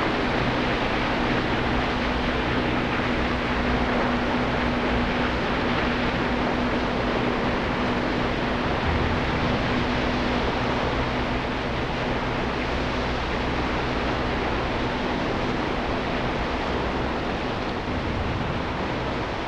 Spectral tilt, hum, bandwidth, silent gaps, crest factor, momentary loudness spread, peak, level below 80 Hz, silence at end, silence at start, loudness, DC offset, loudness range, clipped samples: -6 dB/octave; none; 10 kHz; none; 14 dB; 3 LU; -10 dBFS; -34 dBFS; 0 s; 0 s; -25 LUFS; under 0.1%; 2 LU; under 0.1%